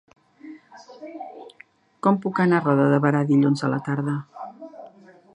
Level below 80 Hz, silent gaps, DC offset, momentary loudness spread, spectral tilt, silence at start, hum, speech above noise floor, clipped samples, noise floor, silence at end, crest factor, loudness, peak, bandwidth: -72 dBFS; none; under 0.1%; 23 LU; -8 dB/octave; 0.45 s; none; 33 dB; under 0.1%; -53 dBFS; 0.45 s; 20 dB; -21 LUFS; -4 dBFS; 9.8 kHz